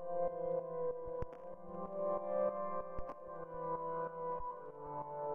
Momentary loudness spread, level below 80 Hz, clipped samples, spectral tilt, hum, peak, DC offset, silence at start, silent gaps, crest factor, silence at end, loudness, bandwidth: 11 LU; -62 dBFS; under 0.1%; -8 dB/octave; none; -24 dBFS; under 0.1%; 0 s; none; 16 dB; 0 s; -42 LUFS; 3.3 kHz